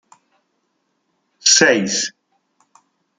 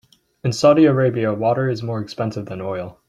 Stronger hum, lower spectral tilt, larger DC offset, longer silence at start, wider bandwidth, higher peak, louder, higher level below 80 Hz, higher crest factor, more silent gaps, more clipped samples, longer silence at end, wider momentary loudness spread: neither; second, -1 dB/octave vs -7 dB/octave; neither; first, 1.45 s vs 0.45 s; about the same, 11 kHz vs 11.5 kHz; about the same, 0 dBFS vs -2 dBFS; first, -14 LUFS vs -19 LUFS; second, -68 dBFS vs -58 dBFS; about the same, 22 dB vs 18 dB; neither; neither; first, 1.1 s vs 0.15 s; second, 11 LU vs 14 LU